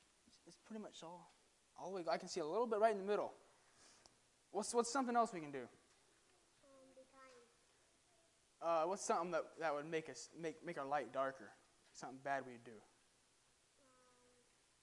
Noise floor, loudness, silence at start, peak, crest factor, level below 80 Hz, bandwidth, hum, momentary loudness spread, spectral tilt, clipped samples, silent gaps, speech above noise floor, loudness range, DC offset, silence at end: -76 dBFS; -43 LUFS; 0.45 s; -22 dBFS; 24 dB; -88 dBFS; 11.5 kHz; none; 21 LU; -4 dB/octave; under 0.1%; none; 33 dB; 8 LU; under 0.1%; 2.05 s